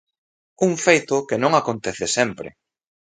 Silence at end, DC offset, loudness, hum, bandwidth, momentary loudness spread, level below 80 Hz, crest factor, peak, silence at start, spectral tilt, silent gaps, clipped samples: 0.65 s; under 0.1%; -20 LUFS; none; 9.6 kHz; 9 LU; -60 dBFS; 22 dB; 0 dBFS; 0.6 s; -4 dB/octave; none; under 0.1%